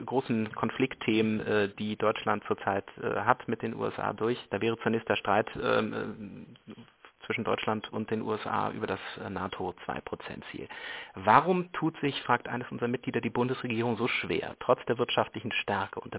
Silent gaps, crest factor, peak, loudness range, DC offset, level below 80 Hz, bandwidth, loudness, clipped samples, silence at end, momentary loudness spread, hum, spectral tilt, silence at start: none; 26 dB; -6 dBFS; 5 LU; under 0.1%; -62 dBFS; 4 kHz; -30 LUFS; under 0.1%; 0 s; 11 LU; none; -4 dB/octave; 0 s